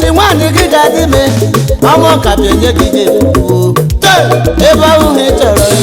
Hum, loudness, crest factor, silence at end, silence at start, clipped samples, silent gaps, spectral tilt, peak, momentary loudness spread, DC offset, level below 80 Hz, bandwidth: none; -7 LUFS; 6 dB; 0 s; 0 s; 0.9%; none; -5 dB/octave; 0 dBFS; 3 LU; under 0.1%; -20 dBFS; over 20 kHz